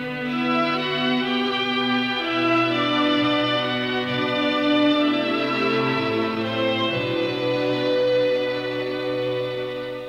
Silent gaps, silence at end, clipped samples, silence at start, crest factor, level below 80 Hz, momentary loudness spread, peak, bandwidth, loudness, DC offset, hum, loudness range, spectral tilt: none; 0 s; under 0.1%; 0 s; 12 dB; -60 dBFS; 6 LU; -10 dBFS; 12 kHz; -22 LUFS; under 0.1%; none; 2 LU; -6 dB/octave